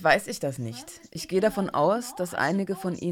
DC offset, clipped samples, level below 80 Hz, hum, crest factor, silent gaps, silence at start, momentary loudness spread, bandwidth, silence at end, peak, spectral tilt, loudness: under 0.1%; under 0.1%; -60 dBFS; none; 20 dB; none; 0 s; 13 LU; 17.5 kHz; 0 s; -8 dBFS; -5 dB/octave; -27 LUFS